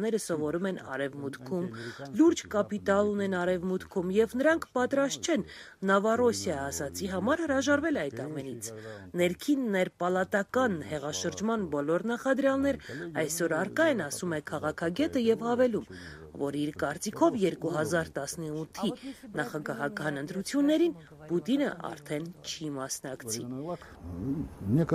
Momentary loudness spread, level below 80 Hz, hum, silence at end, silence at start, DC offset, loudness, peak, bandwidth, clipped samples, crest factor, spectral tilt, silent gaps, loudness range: 11 LU; -60 dBFS; none; 0 s; 0 s; under 0.1%; -30 LUFS; -10 dBFS; 15.5 kHz; under 0.1%; 20 dB; -5 dB/octave; none; 3 LU